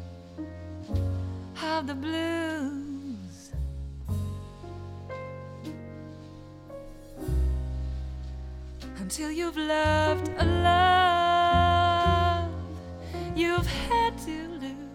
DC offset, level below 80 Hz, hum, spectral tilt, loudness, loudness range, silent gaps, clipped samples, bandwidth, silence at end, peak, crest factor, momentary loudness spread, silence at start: under 0.1%; -38 dBFS; none; -5.5 dB/octave; -27 LUFS; 15 LU; none; under 0.1%; 16 kHz; 0 s; -10 dBFS; 18 dB; 20 LU; 0 s